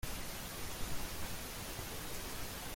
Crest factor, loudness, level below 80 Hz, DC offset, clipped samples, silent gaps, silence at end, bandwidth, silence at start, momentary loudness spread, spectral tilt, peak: 16 dB; -43 LUFS; -50 dBFS; under 0.1%; under 0.1%; none; 0 s; 16.5 kHz; 0 s; 1 LU; -3 dB/octave; -26 dBFS